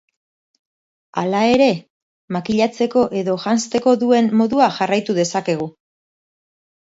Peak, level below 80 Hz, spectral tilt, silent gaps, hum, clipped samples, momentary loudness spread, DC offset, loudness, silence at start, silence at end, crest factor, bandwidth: -2 dBFS; -58 dBFS; -5 dB/octave; 1.90-2.28 s; none; under 0.1%; 10 LU; under 0.1%; -18 LUFS; 1.15 s; 1.25 s; 18 dB; 8 kHz